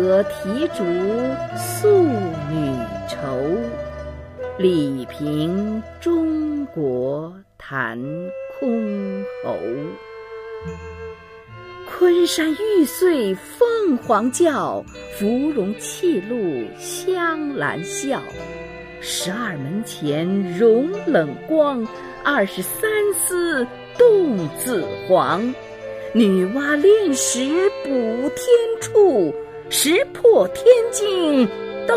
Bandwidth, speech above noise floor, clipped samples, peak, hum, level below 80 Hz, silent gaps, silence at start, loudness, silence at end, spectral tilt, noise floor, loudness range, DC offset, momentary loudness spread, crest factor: 15.5 kHz; 21 dB; under 0.1%; -2 dBFS; none; -50 dBFS; none; 0 s; -20 LUFS; 0 s; -4.5 dB/octave; -40 dBFS; 7 LU; under 0.1%; 16 LU; 18 dB